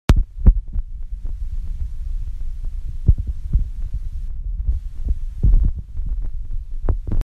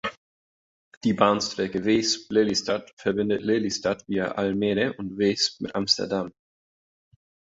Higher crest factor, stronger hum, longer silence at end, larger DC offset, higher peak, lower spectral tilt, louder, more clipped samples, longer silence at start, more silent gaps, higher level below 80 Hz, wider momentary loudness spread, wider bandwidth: about the same, 18 dB vs 22 dB; neither; second, 0 s vs 1.15 s; neither; first, 0 dBFS vs -4 dBFS; first, -7.5 dB/octave vs -4 dB/octave; about the same, -25 LUFS vs -25 LUFS; neither; about the same, 0.1 s vs 0.05 s; second, none vs 0.17-0.91 s, 0.97-1.01 s, 2.93-2.97 s; first, -20 dBFS vs -60 dBFS; first, 13 LU vs 7 LU; second, 7.2 kHz vs 8 kHz